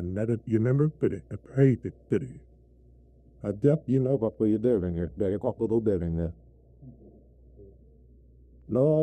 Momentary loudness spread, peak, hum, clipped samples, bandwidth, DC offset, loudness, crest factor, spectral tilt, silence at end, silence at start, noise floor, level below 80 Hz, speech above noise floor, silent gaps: 9 LU; -10 dBFS; none; under 0.1%; 8.8 kHz; under 0.1%; -27 LUFS; 18 dB; -10.5 dB/octave; 0 s; 0 s; -56 dBFS; -54 dBFS; 30 dB; none